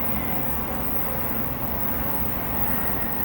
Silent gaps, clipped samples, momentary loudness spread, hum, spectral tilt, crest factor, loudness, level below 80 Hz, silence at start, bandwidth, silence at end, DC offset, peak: none; under 0.1%; 2 LU; none; -6.5 dB/octave; 14 dB; -22 LUFS; -38 dBFS; 0 s; over 20 kHz; 0 s; under 0.1%; -10 dBFS